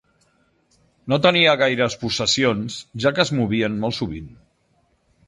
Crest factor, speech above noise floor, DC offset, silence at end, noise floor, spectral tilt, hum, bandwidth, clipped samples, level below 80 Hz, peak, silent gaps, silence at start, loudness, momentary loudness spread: 20 dB; 44 dB; under 0.1%; 1 s; -64 dBFS; -4.5 dB/octave; none; 11.5 kHz; under 0.1%; -50 dBFS; -2 dBFS; none; 1.05 s; -19 LUFS; 14 LU